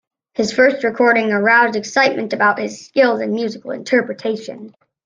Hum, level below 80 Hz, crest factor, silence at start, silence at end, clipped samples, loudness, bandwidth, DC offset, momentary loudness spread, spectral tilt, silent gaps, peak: none; -64 dBFS; 16 dB; 0.4 s; 0.35 s; under 0.1%; -16 LUFS; 9.4 kHz; under 0.1%; 12 LU; -4.5 dB/octave; none; -2 dBFS